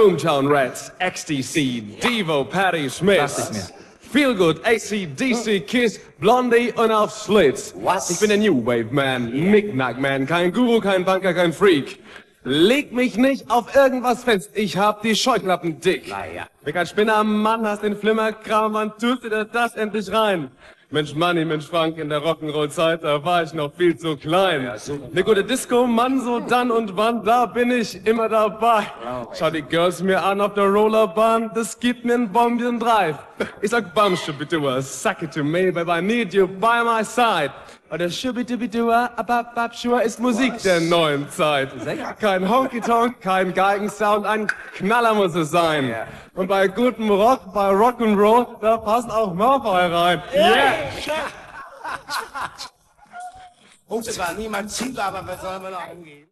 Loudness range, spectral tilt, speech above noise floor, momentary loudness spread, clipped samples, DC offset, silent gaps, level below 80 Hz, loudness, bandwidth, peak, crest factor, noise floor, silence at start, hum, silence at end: 3 LU; -4.5 dB/octave; 28 dB; 10 LU; under 0.1%; under 0.1%; none; -54 dBFS; -20 LUFS; 13 kHz; -4 dBFS; 16 dB; -48 dBFS; 0 s; none; 0.15 s